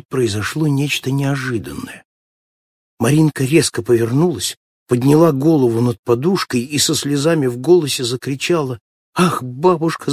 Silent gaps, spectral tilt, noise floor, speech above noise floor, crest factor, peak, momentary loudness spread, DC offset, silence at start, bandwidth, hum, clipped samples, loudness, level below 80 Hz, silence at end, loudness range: 2.05-2.97 s, 4.57-4.86 s, 5.99-6.03 s, 8.80-9.13 s; -5.5 dB/octave; under -90 dBFS; over 74 dB; 16 dB; 0 dBFS; 9 LU; under 0.1%; 0.1 s; 16 kHz; none; under 0.1%; -16 LUFS; -50 dBFS; 0 s; 4 LU